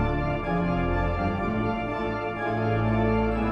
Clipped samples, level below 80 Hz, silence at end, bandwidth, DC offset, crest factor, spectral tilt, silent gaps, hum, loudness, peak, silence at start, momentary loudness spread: under 0.1%; -34 dBFS; 0 s; 7.4 kHz; under 0.1%; 12 dB; -9 dB/octave; none; none; -26 LUFS; -12 dBFS; 0 s; 5 LU